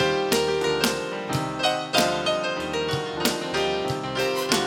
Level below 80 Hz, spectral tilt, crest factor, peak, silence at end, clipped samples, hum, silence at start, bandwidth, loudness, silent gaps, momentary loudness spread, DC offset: -52 dBFS; -3.5 dB/octave; 22 dB; -2 dBFS; 0 s; under 0.1%; none; 0 s; 17 kHz; -24 LUFS; none; 5 LU; under 0.1%